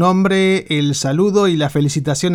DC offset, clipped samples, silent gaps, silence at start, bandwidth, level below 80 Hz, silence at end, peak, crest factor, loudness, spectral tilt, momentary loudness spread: under 0.1%; under 0.1%; none; 0 s; 14.5 kHz; -50 dBFS; 0 s; -2 dBFS; 14 dB; -15 LUFS; -5.5 dB/octave; 4 LU